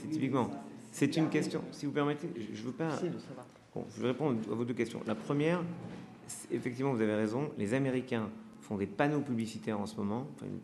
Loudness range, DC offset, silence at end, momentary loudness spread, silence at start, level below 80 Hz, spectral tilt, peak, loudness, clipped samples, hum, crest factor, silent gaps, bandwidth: 2 LU; under 0.1%; 0 s; 13 LU; 0 s; -76 dBFS; -6.5 dB/octave; -14 dBFS; -35 LUFS; under 0.1%; none; 22 dB; none; 13 kHz